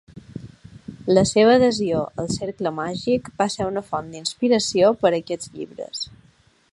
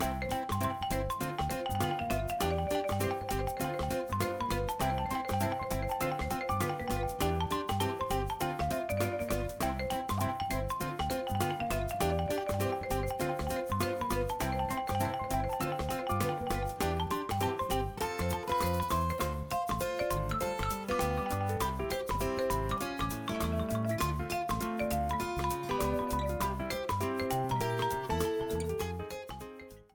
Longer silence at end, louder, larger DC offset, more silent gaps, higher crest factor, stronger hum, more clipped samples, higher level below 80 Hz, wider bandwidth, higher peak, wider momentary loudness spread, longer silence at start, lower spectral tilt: first, 0.6 s vs 0.1 s; first, -21 LUFS vs -33 LUFS; neither; neither; about the same, 20 dB vs 16 dB; neither; neither; second, -52 dBFS vs -44 dBFS; second, 11.5 kHz vs 19.5 kHz; first, -2 dBFS vs -16 dBFS; first, 19 LU vs 3 LU; first, 0.15 s vs 0 s; about the same, -4.5 dB/octave vs -5 dB/octave